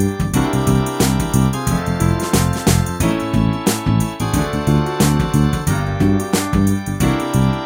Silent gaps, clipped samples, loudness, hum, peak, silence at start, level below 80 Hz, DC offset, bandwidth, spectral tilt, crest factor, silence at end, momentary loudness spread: none; under 0.1%; -17 LUFS; none; -2 dBFS; 0 s; -28 dBFS; under 0.1%; 16.5 kHz; -5.5 dB/octave; 14 dB; 0 s; 3 LU